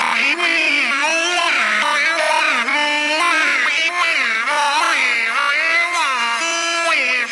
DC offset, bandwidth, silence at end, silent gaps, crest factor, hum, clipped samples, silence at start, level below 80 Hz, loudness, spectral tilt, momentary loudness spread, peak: under 0.1%; 11.5 kHz; 0 s; none; 14 dB; none; under 0.1%; 0 s; -80 dBFS; -15 LUFS; 1 dB/octave; 2 LU; -4 dBFS